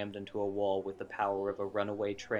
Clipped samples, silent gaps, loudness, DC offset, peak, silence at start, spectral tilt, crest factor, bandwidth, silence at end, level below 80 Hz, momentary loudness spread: under 0.1%; none; -35 LUFS; under 0.1%; -18 dBFS; 0 s; -6 dB/octave; 16 dB; 8.8 kHz; 0 s; -70 dBFS; 4 LU